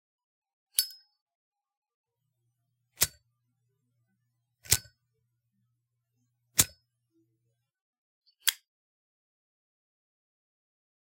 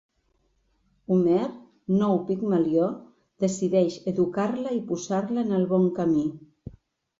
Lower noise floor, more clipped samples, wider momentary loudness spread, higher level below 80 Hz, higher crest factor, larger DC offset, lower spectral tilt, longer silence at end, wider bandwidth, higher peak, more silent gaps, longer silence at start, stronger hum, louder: first, -81 dBFS vs -70 dBFS; neither; second, 4 LU vs 8 LU; about the same, -62 dBFS vs -62 dBFS; first, 34 dB vs 16 dB; neither; second, 0 dB/octave vs -7.5 dB/octave; first, 2.6 s vs 0.5 s; first, 16.5 kHz vs 7.8 kHz; first, -4 dBFS vs -10 dBFS; first, 1.21-1.26 s, 1.35-1.52 s, 1.77-1.82 s, 1.94-2.04 s, 7.81-8.21 s vs none; second, 0.8 s vs 1.1 s; neither; second, -29 LUFS vs -25 LUFS